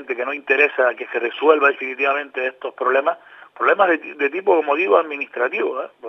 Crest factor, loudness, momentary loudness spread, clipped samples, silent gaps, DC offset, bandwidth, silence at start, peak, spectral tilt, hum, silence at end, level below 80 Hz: 20 dB; -19 LUFS; 9 LU; under 0.1%; none; under 0.1%; 6 kHz; 0 s; 0 dBFS; -5 dB/octave; none; 0 s; -84 dBFS